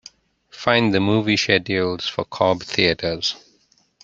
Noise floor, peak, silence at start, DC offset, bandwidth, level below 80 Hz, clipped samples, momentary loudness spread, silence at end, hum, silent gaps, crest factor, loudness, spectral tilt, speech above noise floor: -61 dBFS; -2 dBFS; 0.55 s; under 0.1%; 7.8 kHz; -54 dBFS; under 0.1%; 8 LU; 0.65 s; none; none; 20 dB; -20 LUFS; -4.5 dB/octave; 41 dB